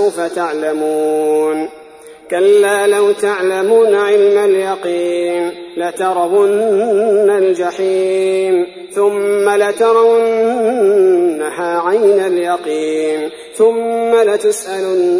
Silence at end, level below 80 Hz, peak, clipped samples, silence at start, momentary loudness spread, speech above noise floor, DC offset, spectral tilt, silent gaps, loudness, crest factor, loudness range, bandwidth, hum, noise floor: 0 s; -62 dBFS; 0 dBFS; under 0.1%; 0 s; 7 LU; 24 dB; under 0.1%; -4 dB/octave; none; -13 LUFS; 12 dB; 2 LU; 11 kHz; none; -37 dBFS